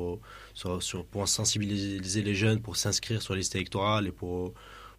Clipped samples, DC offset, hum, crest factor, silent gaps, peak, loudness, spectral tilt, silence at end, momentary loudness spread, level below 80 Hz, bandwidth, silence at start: under 0.1%; under 0.1%; none; 18 dB; none; -12 dBFS; -30 LUFS; -4 dB/octave; 0.05 s; 12 LU; -54 dBFS; 15.5 kHz; 0 s